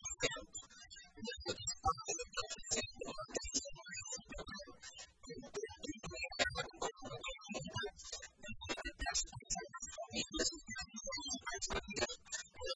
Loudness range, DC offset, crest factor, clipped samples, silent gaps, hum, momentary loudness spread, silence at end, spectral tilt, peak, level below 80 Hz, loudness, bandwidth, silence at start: 3 LU; under 0.1%; 26 dB; under 0.1%; none; none; 12 LU; 0 s; -1.5 dB/octave; -18 dBFS; -58 dBFS; -43 LUFS; 10.5 kHz; 0 s